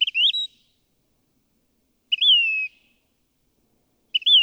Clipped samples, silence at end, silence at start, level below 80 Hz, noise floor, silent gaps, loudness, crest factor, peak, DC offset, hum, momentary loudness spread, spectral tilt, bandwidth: under 0.1%; 0 s; 0 s; -76 dBFS; -69 dBFS; none; -19 LUFS; 16 dB; -8 dBFS; under 0.1%; none; 14 LU; 3.5 dB/octave; 8.8 kHz